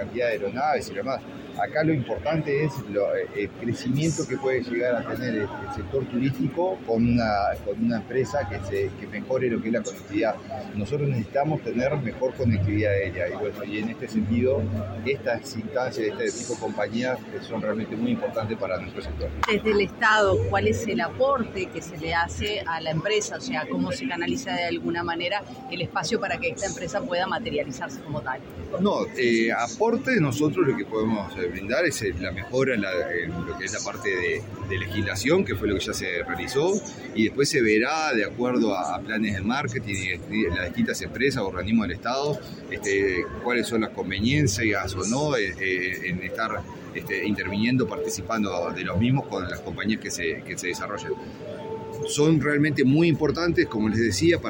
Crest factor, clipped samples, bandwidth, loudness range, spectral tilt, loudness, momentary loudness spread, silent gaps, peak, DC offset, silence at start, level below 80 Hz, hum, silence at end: 18 dB; under 0.1%; 17 kHz; 4 LU; -5 dB/octave; -26 LUFS; 9 LU; none; -6 dBFS; under 0.1%; 0 s; -50 dBFS; none; 0 s